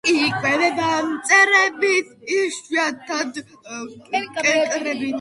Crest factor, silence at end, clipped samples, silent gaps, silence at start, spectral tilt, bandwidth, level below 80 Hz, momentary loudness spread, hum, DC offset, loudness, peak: 18 dB; 0 s; under 0.1%; none; 0.05 s; -2.5 dB/octave; 11.5 kHz; -64 dBFS; 15 LU; none; under 0.1%; -19 LUFS; -2 dBFS